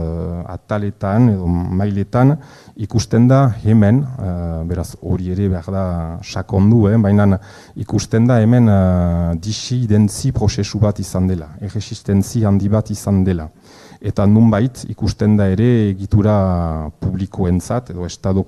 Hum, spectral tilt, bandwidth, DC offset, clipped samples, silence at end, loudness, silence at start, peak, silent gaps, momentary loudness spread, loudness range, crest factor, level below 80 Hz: none; -7.5 dB/octave; 12.5 kHz; under 0.1%; under 0.1%; 0 s; -16 LUFS; 0 s; 0 dBFS; none; 12 LU; 3 LU; 14 dB; -38 dBFS